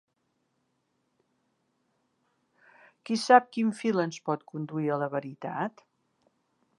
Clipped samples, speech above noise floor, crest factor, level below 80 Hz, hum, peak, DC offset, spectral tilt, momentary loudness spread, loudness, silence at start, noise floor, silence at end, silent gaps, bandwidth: under 0.1%; 49 dB; 26 dB; -86 dBFS; none; -4 dBFS; under 0.1%; -5.5 dB/octave; 15 LU; -28 LUFS; 3.05 s; -77 dBFS; 1.1 s; none; 11 kHz